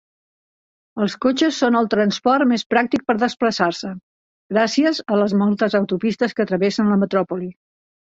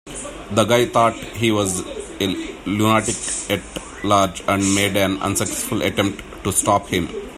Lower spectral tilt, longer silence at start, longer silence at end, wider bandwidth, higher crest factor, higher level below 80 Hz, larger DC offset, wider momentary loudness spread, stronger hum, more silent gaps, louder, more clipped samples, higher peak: first, -5.5 dB/octave vs -4 dB/octave; first, 0.95 s vs 0.05 s; first, 0.6 s vs 0 s; second, 7.8 kHz vs 16 kHz; about the same, 16 dB vs 20 dB; second, -62 dBFS vs -44 dBFS; neither; about the same, 8 LU vs 9 LU; neither; first, 2.66-2.70 s, 4.03-4.50 s vs none; about the same, -19 LUFS vs -19 LUFS; neither; second, -4 dBFS vs 0 dBFS